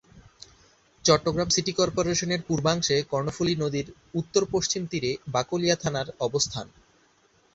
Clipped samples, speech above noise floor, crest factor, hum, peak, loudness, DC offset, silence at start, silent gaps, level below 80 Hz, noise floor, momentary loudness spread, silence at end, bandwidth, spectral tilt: under 0.1%; 37 dB; 22 dB; none; -4 dBFS; -26 LUFS; under 0.1%; 0.15 s; none; -54 dBFS; -63 dBFS; 7 LU; 0.85 s; 8 kHz; -4 dB/octave